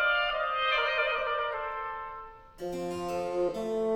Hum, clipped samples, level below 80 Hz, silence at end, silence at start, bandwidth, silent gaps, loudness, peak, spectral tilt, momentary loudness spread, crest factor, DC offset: none; under 0.1%; -56 dBFS; 0 s; 0 s; 16.5 kHz; none; -30 LUFS; -16 dBFS; -4 dB/octave; 14 LU; 16 dB; under 0.1%